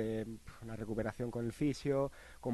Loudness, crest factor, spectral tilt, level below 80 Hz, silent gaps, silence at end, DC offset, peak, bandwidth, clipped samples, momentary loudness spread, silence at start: -39 LUFS; 16 dB; -7 dB/octave; -58 dBFS; none; 0 s; under 0.1%; -22 dBFS; 12 kHz; under 0.1%; 11 LU; 0 s